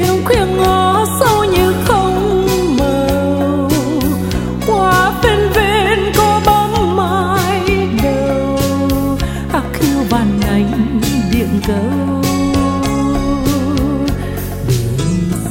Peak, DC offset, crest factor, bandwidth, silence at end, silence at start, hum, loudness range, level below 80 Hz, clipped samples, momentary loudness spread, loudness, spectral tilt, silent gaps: 0 dBFS; under 0.1%; 14 dB; 16.5 kHz; 0 s; 0 s; none; 3 LU; -26 dBFS; under 0.1%; 5 LU; -14 LUFS; -5.5 dB/octave; none